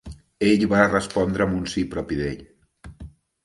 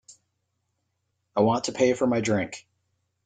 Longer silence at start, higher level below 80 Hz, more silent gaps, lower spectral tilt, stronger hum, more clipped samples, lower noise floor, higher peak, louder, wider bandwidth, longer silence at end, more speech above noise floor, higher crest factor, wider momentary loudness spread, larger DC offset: second, 0.05 s vs 1.35 s; first, -44 dBFS vs -66 dBFS; neither; about the same, -6 dB/octave vs -5 dB/octave; neither; neither; second, -46 dBFS vs -77 dBFS; first, 0 dBFS vs -8 dBFS; first, -22 LUFS vs -25 LUFS; first, 11.5 kHz vs 9.4 kHz; second, 0.35 s vs 0.65 s; second, 25 dB vs 54 dB; about the same, 22 dB vs 20 dB; first, 22 LU vs 11 LU; neither